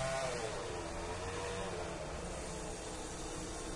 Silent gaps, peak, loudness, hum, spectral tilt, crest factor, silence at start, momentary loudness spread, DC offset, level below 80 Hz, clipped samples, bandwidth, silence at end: none; -26 dBFS; -42 LUFS; none; -3.5 dB/octave; 14 dB; 0 s; 5 LU; under 0.1%; -50 dBFS; under 0.1%; 11.5 kHz; 0 s